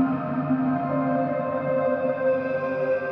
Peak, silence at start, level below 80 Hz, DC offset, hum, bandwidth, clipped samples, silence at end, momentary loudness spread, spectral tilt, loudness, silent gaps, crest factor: -12 dBFS; 0 s; -64 dBFS; under 0.1%; none; 5.2 kHz; under 0.1%; 0 s; 2 LU; -10.5 dB/octave; -25 LUFS; none; 12 dB